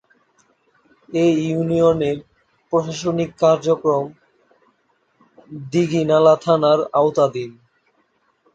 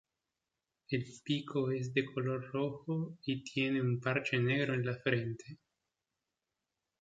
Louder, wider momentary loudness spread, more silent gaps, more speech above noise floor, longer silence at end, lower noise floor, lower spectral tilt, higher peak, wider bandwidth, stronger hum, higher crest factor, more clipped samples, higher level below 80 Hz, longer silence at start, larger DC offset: first, -18 LUFS vs -35 LUFS; first, 14 LU vs 7 LU; neither; second, 47 dB vs 54 dB; second, 1.05 s vs 1.45 s; second, -64 dBFS vs -89 dBFS; about the same, -6.5 dB/octave vs -6.5 dB/octave; first, -2 dBFS vs -16 dBFS; first, 8.6 kHz vs 7.8 kHz; neither; about the same, 18 dB vs 20 dB; neither; first, -58 dBFS vs -72 dBFS; first, 1.1 s vs 0.9 s; neither